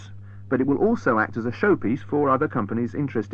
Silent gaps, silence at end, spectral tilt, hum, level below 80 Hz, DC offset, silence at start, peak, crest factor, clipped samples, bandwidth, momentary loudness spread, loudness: none; 0 s; -9 dB/octave; none; -54 dBFS; 0.4%; 0 s; -8 dBFS; 16 dB; under 0.1%; 7.2 kHz; 6 LU; -23 LUFS